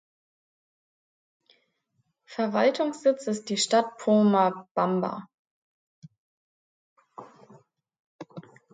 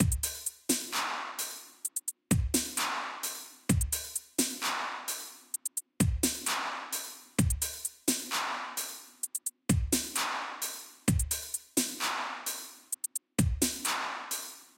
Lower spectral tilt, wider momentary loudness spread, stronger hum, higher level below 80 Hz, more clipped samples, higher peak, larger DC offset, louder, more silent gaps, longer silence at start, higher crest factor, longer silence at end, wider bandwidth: first, -5 dB/octave vs -3 dB/octave; first, 23 LU vs 8 LU; neither; second, -80 dBFS vs -42 dBFS; neither; about the same, -10 dBFS vs -10 dBFS; neither; first, -25 LUFS vs -32 LUFS; first, 4.71-4.75 s, 5.34-6.02 s, 6.18-6.96 s, 7.99-8.19 s vs none; first, 2.3 s vs 0 s; about the same, 20 dB vs 22 dB; first, 0.3 s vs 0.1 s; second, 9.4 kHz vs 17 kHz